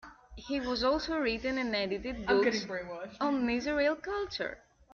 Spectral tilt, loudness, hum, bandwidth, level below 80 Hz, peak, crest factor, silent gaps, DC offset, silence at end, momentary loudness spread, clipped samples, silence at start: -4.5 dB/octave; -32 LUFS; none; 7.2 kHz; -54 dBFS; -14 dBFS; 18 dB; none; under 0.1%; 0.35 s; 11 LU; under 0.1%; 0.05 s